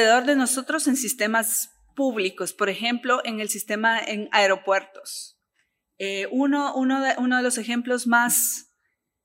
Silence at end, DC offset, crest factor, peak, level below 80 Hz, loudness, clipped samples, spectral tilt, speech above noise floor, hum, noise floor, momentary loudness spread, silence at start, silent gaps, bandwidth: 0.65 s; under 0.1%; 20 dB; -4 dBFS; -76 dBFS; -23 LUFS; under 0.1%; -2 dB/octave; 53 dB; none; -76 dBFS; 10 LU; 0 s; none; 16 kHz